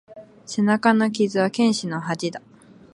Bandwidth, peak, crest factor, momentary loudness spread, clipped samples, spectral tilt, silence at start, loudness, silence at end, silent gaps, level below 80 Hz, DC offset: 11 kHz; -2 dBFS; 20 dB; 13 LU; under 0.1%; -5 dB/octave; 0.1 s; -21 LUFS; 0.55 s; none; -68 dBFS; under 0.1%